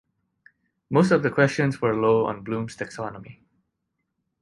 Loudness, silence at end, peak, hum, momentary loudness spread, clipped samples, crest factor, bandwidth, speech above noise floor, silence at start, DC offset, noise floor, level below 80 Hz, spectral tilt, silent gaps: -23 LUFS; 1.1 s; -6 dBFS; none; 14 LU; under 0.1%; 20 dB; 11.5 kHz; 56 dB; 0.9 s; under 0.1%; -78 dBFS; -60 dBFS; -7 dB/octave; none